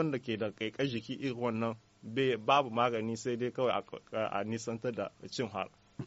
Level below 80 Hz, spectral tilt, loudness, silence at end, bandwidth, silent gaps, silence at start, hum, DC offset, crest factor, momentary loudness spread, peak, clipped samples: -72 dBFS; -4 dB/octave; -34 LUFS; 0 s; 8 kHz; none; 0 s; none; under 0.1%; 20 dB; 11 LU; -14 dBFS; under 0.1%